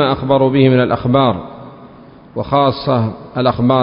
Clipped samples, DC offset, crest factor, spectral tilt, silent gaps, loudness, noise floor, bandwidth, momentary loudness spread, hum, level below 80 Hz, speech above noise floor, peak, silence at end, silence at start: under 0.1%; under 0.1%; 14 dB; -12.5 dB/octave; none; -14 LUFS; -39 dBFS; 5.4 kHz; 15 LU; none; -42 dBFS; 26 dB; 0 dBFS; 0 s; 0 s